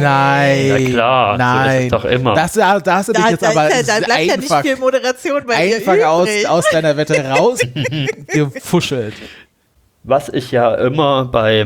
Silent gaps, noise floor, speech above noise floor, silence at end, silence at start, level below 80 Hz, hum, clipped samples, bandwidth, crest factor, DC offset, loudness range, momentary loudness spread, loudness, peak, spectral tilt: none; -57 dBFS; 43 dB; 0 s; 0 s; -46 dBFS; none; under 0.1%; 20 kHz; 14 dB; under 0.1%; 5 LU; 5 LU; -14 LUFS; 0 dBFS; -5 dB/octave